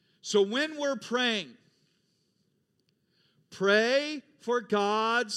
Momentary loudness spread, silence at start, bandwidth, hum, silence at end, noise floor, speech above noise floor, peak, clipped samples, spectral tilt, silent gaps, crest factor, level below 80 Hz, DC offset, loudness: 9 LU; 0.25 s; 12 kHz; none; 0 s; -74 dBFS; 46 dB; -10 dBFS; under 0.1%; -3.5 dB/octave; none; 20 dB; -88 dBFS; under 0.1%; -28 LUFS